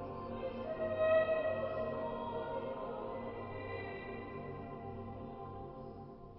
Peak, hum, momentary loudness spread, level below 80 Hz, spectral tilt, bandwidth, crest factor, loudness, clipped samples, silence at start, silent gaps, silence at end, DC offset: -22 dBFS; none; 16 LU; -60 dBFS; -5 dB/octave; 5.6 kHz; 18 dB; -40 LUFS; under 0.1%; 0 s; none; 0 s; under 0.1%